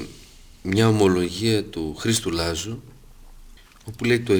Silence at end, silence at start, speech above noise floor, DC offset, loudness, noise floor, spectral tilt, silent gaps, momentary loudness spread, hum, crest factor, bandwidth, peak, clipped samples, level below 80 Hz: 0 s; 0 s; 25 dB; under 0.1%; -22 LUFS; -46 dBFS; -5 dB/octave; none; 20 LU; none; 18 dB; over 20 kHz; -4 dBFS; under 0.1%; -44 dBFS